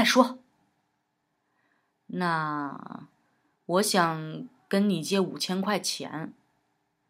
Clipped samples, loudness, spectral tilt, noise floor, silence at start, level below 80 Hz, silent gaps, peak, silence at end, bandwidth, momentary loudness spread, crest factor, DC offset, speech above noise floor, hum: under 0.1%; -27 LUFS; -4 dB/octave; -77 dBFS; 0 s; -86 dBFS; none; -6 dBFS; 0.8 s; 16 kHz; 19 LU; 24 dB; under 0.1%; 50 dB; none